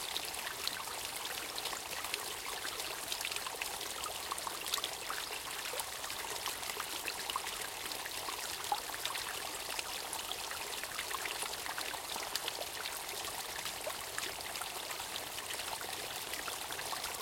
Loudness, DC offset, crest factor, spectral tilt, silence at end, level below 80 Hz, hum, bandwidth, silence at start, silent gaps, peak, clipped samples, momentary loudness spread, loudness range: -38 LUFS; under 0.1%; 26 dB; 0 dB/octave; 0 s; -66 dBFS; none; 17 kHz; 0 s; none; -14 dBFS; under 0.1%; 2 LU; 1 LU